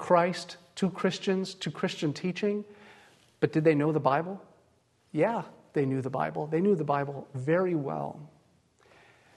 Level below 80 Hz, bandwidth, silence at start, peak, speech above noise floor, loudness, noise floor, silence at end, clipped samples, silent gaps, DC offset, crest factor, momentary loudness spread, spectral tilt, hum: -72 dBFS; 12 kHz; 0 s; -8 dBFS; 39 dB; -29 LUFS; -67 dBFS; 1.1 s; under 0.1%; none; under 0.1%; 20 dB; 12 LU; -6.5 dB/octave; none